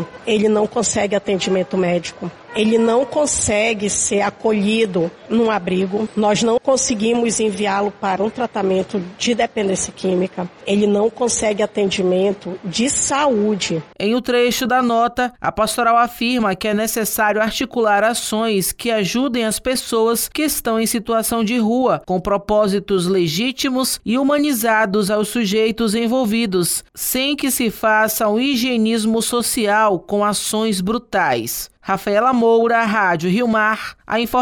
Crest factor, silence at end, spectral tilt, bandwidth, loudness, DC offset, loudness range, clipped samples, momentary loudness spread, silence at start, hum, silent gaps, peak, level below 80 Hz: 14 dB; 0 s; -3.5 dB/octave; 19.5 kHz; -18 LUFS; under 0.1%; 1 LU; under 0.1%; 5 LU; 0 s; none; none; -4 dBFS; -48 dBFS